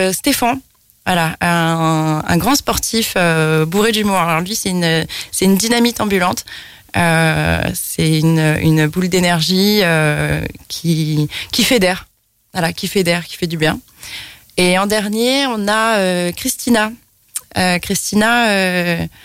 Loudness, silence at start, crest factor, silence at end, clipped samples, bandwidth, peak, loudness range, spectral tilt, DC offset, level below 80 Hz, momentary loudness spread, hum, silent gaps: -15 LUFS; 0 s; 12 dB; 0.15 s; under 0.1%; 16.5 kHz; -2 dBFS; 3 LU; -4.5 dB/octave; under 0.1%; -40 dBFS; 10 LU; none; none